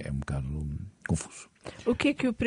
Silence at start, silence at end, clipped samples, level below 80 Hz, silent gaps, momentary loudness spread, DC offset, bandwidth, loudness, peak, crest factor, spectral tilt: 0 s; 0 s; under 0.1%; -44 dBFS; none; 15 LU; under 0.1%; 10.5 kHz; -31 LUFS; -12 dBFS; 18 dB; -6 dB/octave